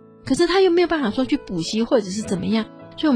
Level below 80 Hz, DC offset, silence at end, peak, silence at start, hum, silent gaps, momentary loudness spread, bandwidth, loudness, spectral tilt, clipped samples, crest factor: -48 dBFS; under 0.1%; 0 s; -6 dBFS; 0.25 s; none; none; 8 LU; 10.5 kHz; -20 LUFS; -5 dB/octave; under 0.1%; 16 dB